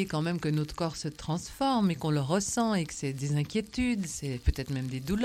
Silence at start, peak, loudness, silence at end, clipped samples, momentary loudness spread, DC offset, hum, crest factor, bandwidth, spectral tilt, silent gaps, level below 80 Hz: 0 s; -12 dBFS; -31 LUFS; 0 s; under 0.1%; 6 LU; under 0.1%; none; 16 dB; 16 kHz; -5.5 dB/octave; none; -42 dBFS